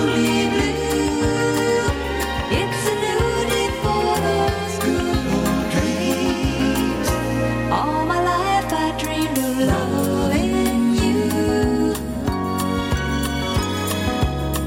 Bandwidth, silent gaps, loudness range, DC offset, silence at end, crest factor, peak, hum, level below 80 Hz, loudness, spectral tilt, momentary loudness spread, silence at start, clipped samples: 17 kHz; none; 1 LU; under 0.1%; 0 s; 12 dB; -8 dBFS; none; -32 dBFS; -20 LUFS; -5 dB/octave; 4 LU; 0 s; under 0.1%